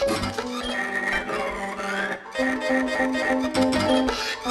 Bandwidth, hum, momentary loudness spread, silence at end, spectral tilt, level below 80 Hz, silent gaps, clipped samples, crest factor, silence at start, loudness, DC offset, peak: 13.5 kHz; none; 7 LU; 0 s; -4 dB/octave; -46 dBFS; none; under 0.1%; 16 dB; 0 s; -24 LUFS; under 0.1%; -8 dBFS